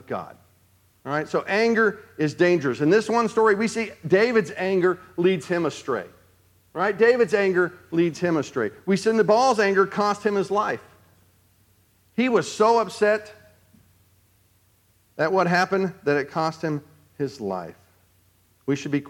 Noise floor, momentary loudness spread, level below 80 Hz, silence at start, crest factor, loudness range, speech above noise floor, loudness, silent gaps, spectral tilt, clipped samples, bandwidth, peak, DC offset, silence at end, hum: -62 dBFS; 12 LU; -70 dBFS; 0.1 s; 18 dB; 5 LU; 40 dB; -22 LUFS; none; -5.5 dB/octave; under 0.1%; 15.5 kHz; -6 dBFS; under 0.1%; 0 s; none